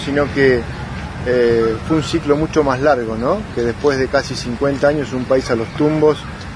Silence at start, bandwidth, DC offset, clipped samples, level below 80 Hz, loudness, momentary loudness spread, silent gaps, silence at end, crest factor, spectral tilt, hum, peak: 0 s; 10.5 kHz; under 0.1%; under 0.1%; -36 dBFS; -17 LUFS; 7 LU; none; 0 s; 16 dB; -6 dB/octave; none; -2 dBFS